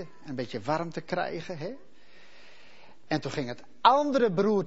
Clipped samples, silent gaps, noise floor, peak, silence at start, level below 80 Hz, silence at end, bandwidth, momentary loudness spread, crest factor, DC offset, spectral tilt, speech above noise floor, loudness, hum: under 0.1%; none; -57 dBFS; -6 dBFS; 0 s; -68 dBFS; 0 s; 8 kHz; 16 LU; 24 dB; 0.6%; -6 dB/octave; 29 dB; -29 LUFS; none